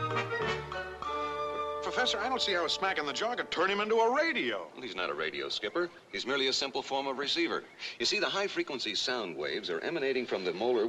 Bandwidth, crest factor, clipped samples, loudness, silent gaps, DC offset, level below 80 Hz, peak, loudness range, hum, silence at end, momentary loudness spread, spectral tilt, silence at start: 12.5 kHz; 16 dB; under 0.1%; -32 LUFS; none; under 0.1%; -64 dBFS; -16 dBFS; 3 LU; none; 0 s; 7 LU; -3 dB/octave; 0 s